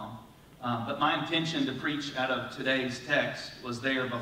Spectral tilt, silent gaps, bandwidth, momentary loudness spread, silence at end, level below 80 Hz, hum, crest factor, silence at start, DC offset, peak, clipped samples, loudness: -4.5 dB/octave; none; 16 kHz; 10 LU; 0 s; -64 dBFS; none; 20 dB; 0 s; under 0.1%; -12 dBFS; under 0.1%; -31 LUFS